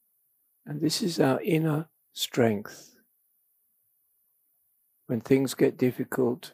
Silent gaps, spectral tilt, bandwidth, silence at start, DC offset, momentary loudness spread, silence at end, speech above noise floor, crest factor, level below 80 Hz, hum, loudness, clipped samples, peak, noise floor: none; -5.5 dB/octave; 15.5 kHz; 0.65 s; under 0.1%; 12 LU; 0.05 s; 45 dB; 20 dB; -72 dBFS; none; -27 LUFS; under 0.1%; -8 dBFS; -71 dBFS